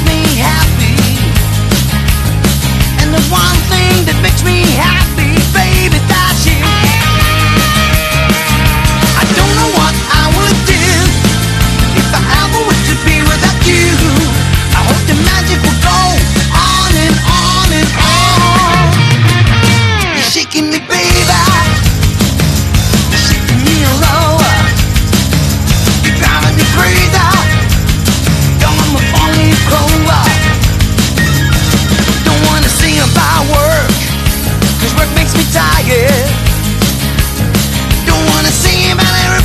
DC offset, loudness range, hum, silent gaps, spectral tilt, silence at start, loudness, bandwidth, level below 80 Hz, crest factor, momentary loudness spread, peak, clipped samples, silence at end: under 0.1%; 2 LU; none; none; -4 dB/octave; 0 s; -9 LUFS; 14.5 kHz; -16 dBFS; 8 dB; 3 LU; 0 dBFS; 0.3%; 0 s